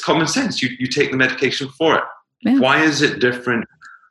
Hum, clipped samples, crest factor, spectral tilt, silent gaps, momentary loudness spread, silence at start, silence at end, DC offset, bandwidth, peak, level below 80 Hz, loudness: none; under 0.1%; 18 dB; -4 dB/octave; none; 8 LU; 0 s; 0.2 s; under 0.1%; 12 kHz; 0 dBFS; -60 dBFS; -17 LUFS